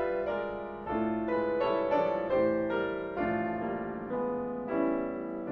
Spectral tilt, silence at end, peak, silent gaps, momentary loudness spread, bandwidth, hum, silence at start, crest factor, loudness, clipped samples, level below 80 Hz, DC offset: -9 dB/octave; 0 s; -16 dBFS; none; 7 LU; 5.8 kHz; none; 0 s; 16 dB; -32 LUFS; under 0.1%; -58 dBFS; under 0.1%